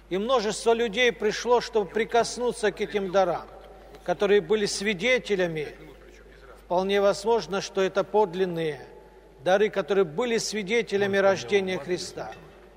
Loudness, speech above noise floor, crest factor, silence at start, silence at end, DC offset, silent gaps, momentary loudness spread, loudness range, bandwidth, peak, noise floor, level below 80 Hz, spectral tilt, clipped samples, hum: -25 LUFS; 25 dB; 16 dB; 0.1 s; 0.25 s; under 0.1%; none; 9 LU; 2 LU; 15.5 kHz; -10 dBFS; -49 dBFS; -54 dBFS; -4 dB/octave; under 0.1%; none